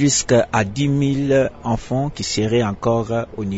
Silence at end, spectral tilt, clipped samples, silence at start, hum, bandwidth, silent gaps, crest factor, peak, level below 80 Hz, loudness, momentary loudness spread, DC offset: 0 s; -5 dB/octave; under 0.1%; 0 s; none; 8 kHz; none; 16 dB; -4 dBFS; -42 dBFS; -19 LUFS; 7 LU; under 0.1%